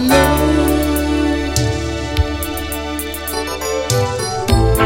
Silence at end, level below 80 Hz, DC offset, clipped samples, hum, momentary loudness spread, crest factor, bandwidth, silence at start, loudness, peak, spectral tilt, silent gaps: 0 s; -24 dBFS; under 0.1%; under 0.1%; none; 8 LU; 16 dB; 17 kHz; 0 s; -17 LUFS; 0 dBFS; -5 dB/octave; none